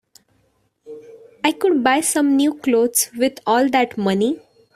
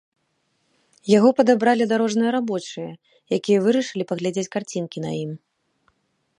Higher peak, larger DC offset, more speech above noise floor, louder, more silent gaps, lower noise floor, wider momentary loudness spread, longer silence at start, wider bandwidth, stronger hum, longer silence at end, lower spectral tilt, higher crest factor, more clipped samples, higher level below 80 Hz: first, 0 dBFS vs -4 dBFS; neither; second, 46 dB vs 50 dB; first, -18 LUFS vs -21 LUFS; neither; second, -64 dBFS vs -70 dBFS; second, 6 LU vs 17 LU; second, 0.85 s vs 1.05 s; first, 16 kHz vs 11 kHz; neither; second, 0.4 s vs 1 s; second, -3.5 dB/octave vs -5.5 dB/octave; about the same, 18 dB vs 20 dB; neither; first, -64 dBFS vs -72 dBFS